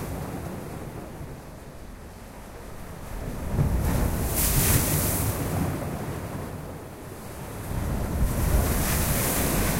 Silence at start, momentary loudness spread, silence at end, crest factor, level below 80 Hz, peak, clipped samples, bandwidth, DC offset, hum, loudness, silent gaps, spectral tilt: 0 s; 19 LU; 0 s; 18 dB; -32 dBFS; -10 dBFS; under 0.1%; 16 kHz; under 0.1%; none; -26 LUFS; none; -4.5 dB/octave